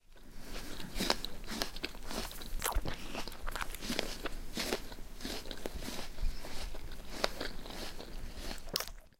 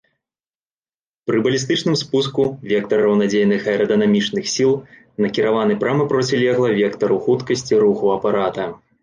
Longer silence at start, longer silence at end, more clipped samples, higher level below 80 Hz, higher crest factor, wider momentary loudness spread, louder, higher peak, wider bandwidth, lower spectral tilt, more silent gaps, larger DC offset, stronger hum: second, 0.1 s vs 1.25 s; second, 0.1 s vs 0.25 s; neither; first, -42 dBFS vs -58 dBFS; first, 28 dB vs 14 dB; first, 10 LU vs 6 LU; second, -40 LUFS vs -18 LUFS; second, -10 dBFS vs -6 dBFS; first, 17 kHz vs 9.8 kHz; second, -3 dB/octave vs -5 dB/octave; neither; neither; neither